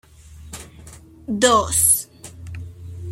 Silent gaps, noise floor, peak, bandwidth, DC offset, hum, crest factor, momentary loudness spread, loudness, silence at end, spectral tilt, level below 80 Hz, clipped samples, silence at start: none; -43 dBFS; -2 dBFS; 16.5 kHz; under 0.1%; none; 22 dB; 24 LU; -16 LUFS; 0 s; -2.5 dB/octave; -46 dBFS; under 0.1%; 0.25 s